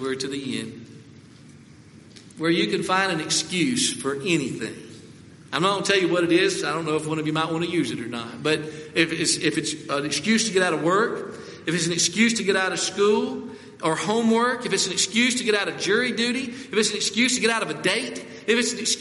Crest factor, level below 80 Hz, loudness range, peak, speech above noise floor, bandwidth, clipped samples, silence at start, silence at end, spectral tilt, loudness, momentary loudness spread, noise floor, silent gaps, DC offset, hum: 20 dB; -66 dBFS; 3 LU; -4 dBFS; 24 dB; 11.5 kHz; under 0.1%; 0 s; 0 s; -3 dB/octave; -23 LUFS; 11 LU; -48 dBFS; none; under 0.1%; none